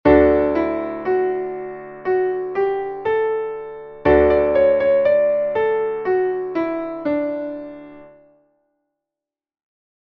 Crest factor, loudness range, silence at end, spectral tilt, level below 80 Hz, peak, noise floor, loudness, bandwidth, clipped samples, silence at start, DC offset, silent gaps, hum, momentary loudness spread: 18 dB; 9 LU; 2 s; -9 dB/octave; -40 dBFS; -2 dBFS; -88 dBFS; -19 LUFS; 5.4 kHz; under 0.1%; 0.05 s; under 0.1%; none; none; 14 LU